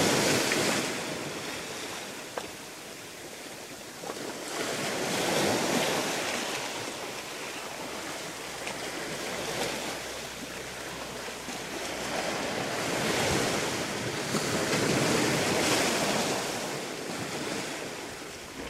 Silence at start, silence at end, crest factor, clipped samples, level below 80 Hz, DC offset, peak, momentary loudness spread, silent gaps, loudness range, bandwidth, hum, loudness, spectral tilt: 0 s; 0 s; 20 dB; under 0.1%; -58 dBFS; under 0.1%; -12 dBFS; 13 LU; none; 8 LU; 16 kHz; none; -30 LUFS; -3 dB/octave